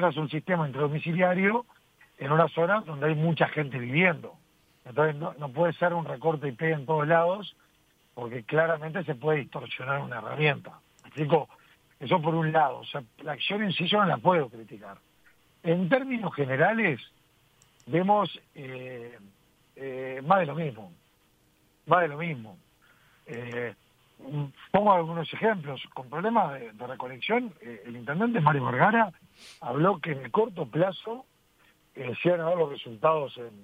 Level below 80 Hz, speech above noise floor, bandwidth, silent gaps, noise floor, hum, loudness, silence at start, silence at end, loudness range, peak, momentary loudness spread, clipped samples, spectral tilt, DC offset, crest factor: -70 dBFS; 38 dB; 9.2 kHz; none; -65 dBFS; none; -27 LUFS; 0 s; 0 s; 4 LU; -6 dBFS; 16 LU; under 0.1%; -8 dB/octave; under 0.1%; 22 dB